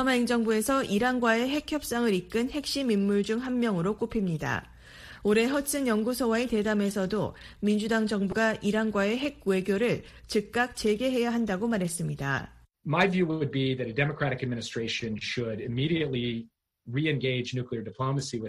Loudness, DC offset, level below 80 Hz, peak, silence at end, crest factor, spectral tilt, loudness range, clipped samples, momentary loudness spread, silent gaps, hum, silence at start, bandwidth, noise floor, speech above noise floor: -28 LUFS; under 0.1%; -54 dBFS; -8 dBFS; 0 s; 20 dB; -5.5 dB/octave; 3 LU; under 0.1%; 7 LU; none; none; 0 s; 15 kHz; -48 dBFS; 21 dB